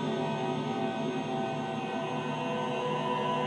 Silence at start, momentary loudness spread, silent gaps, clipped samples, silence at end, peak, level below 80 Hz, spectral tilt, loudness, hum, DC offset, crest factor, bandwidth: 0 s; 3 LU; none; under 0.1%; 0 s; -18 dBFS; -74 dBFS; -6 dB/octave; -32 LUFS; none; under 0.1%; 14 dB; 10 kHz